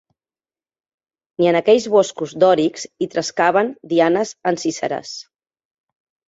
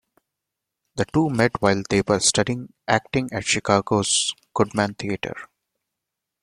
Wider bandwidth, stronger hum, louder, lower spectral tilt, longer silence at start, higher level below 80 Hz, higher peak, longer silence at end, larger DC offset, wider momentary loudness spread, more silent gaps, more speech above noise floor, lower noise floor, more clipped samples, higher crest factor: second, 8 kHz vs 12.5 kHz; neither; first, -18 LUFS vs -22 LUFS; about the same, -4.5 dB/octave vs -3.5 dB/octave; first, 1.4 s vs 0.95 s; second, -64 dBFS vs -52 dBFS; about the same, -2 dBFS vs -2 dBFS; about the same, 1.1 s vs 1 s; neither; about the same, 12 LU vs 10 LU; neither; first, over 73 dB vs 62 dB; first, under -90 dBFS vs -83 dBFS; neither; about the same, 18 dB vs 22 dB